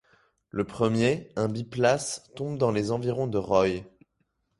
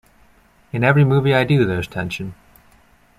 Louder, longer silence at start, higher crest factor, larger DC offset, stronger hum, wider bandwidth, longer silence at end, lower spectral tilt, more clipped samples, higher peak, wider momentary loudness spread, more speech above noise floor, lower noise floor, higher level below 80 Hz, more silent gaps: second, -27 LUFS vs -18 LUFS; second, 0.55 s vs 0.75 s; about the same, 20 dB vs 18 dB; neither; neither; second, 11.5 kHz vs 13 kHz; second, 0.7 s vs 0.85 s; second, -5.5 dB/octave vs -7.5 dB/octave; neither; second, -8 dBFS vs -2 dBFS; second, 10 LU vs 15 LU; first, 49 dB vs 37 dB; first, -75 dBFS vs -53 dBFS; second, -56 dBFS vs -48 dBFS; neither